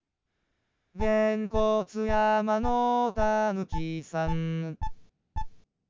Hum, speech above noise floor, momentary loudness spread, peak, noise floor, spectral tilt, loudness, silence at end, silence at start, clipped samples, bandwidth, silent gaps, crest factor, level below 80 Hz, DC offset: none; 54 dB; 16 LU; -12 dBFS; -80 dBFS; -7 dB/octave; -28 LUFS; 0.3 s; 0.95 s; under 0.1%; 7.6 kHz; none; 16 dB; -42 dBFS; under 0.1%